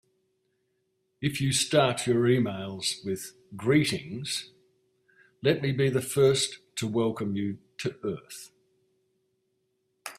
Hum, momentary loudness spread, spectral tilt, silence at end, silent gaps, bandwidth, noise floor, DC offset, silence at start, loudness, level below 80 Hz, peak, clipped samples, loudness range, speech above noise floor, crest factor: none; 12 LU; -4.5 dB/octave; 0.05 s; none; 15.5 kHz; -76 dBFS; under 0.1%; 1.2 s; -27 LUFS; -64 dBFS; -8 dBFS; under 0.1%; 6 LU; 49 dB; 22 dB